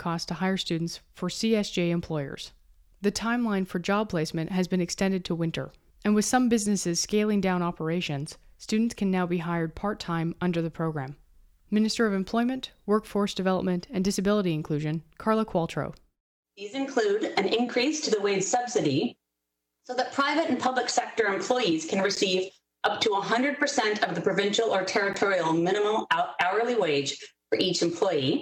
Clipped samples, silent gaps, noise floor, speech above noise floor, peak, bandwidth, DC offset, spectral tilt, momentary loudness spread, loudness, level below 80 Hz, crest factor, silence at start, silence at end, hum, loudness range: under 0.1%; 16.20-16.43 s; -83 dBFS; 56 dB; -10 dBFS; 16 kHz; under 0.1%; -4.5 dB/octave; 8 LU; -27 LUFS; -58 dBFS; 18 dB; 0 s; 0 s; none; 4 LU